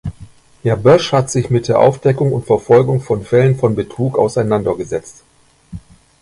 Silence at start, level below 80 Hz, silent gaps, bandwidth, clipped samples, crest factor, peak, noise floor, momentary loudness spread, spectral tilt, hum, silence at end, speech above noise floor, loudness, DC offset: 0.05 s; -44 dBFS; none; 11.5 kHz; under 0.1%; 14 dB; 0 dBFS; -40 dBFS; 14 LU; -6.5 dB/octave; none; 0.45 s; 27 dB; -14 LUFS; under 0.1%